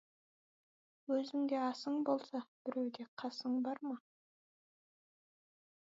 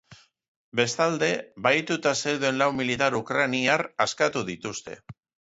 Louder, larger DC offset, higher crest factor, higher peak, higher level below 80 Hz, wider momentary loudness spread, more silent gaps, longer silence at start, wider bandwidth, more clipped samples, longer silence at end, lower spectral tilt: second, -40 LUFS vs -25 LUFS; neither; about the same, 20 dB vs 20 dB; second, -22 dBFS vs -8 dBFS; second, under -90 dBFS vs -64 dBFS; about the same, 9 LU vs 10 LU; about the same, 2.48-2.65 s, 3.08-3.17 s vs 0.48-0.72 s; first, 1.1 s vs 0.1 s; about the same, 7.6 kHz vs 8 kHz; neither; first, 1.85 s vs 0.3 s; about the same, -3 dB/octave vs -3.5 dB/octave